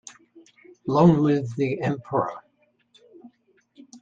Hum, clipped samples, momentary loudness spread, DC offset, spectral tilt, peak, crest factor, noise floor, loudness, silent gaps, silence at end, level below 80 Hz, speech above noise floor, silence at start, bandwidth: none; under 0.1%; 20 LU; under 0.1%; -8 dB/octave; -4 dBFS; 22 dB; -66 dBFS; -22 LUFS; none; 0.05 s; -62 dBFS; 45 dB; 0.05 s; 7.6 kHz